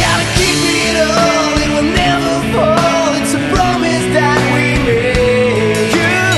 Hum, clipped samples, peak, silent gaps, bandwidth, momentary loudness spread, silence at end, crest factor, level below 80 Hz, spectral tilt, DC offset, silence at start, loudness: none; under 0.1%; 0 dBFS; none; 12.5 kHz; 2 LU; 0 s; 12 dB; -28 dBFS; -4 dB/octave; under 0.1%; 0 s; -12 LUFS